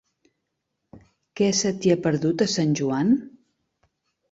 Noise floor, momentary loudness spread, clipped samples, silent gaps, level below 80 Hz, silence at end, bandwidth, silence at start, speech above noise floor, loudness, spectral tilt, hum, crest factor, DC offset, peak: -79 dBFS; 2 LU; under 0.1%; none; -62 dBFS; 1 s; 8 kHz; 0.95 s; 57 dB; -22 LUFS; -5 dB/octave; none; 18 dB; under 0.1%; -8 dBFS